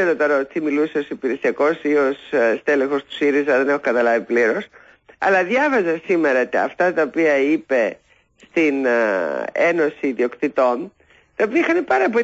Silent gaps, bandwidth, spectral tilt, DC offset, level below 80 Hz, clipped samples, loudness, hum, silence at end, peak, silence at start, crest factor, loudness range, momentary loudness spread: none; 7.8 kHz; -5.5 dB/octave; under 0.1%; -64 dBFS; under 0.1%; -19 LUFS; none; 0 s; -6 dBFS; 0 s; 12 dB; 2 LU; 6 LU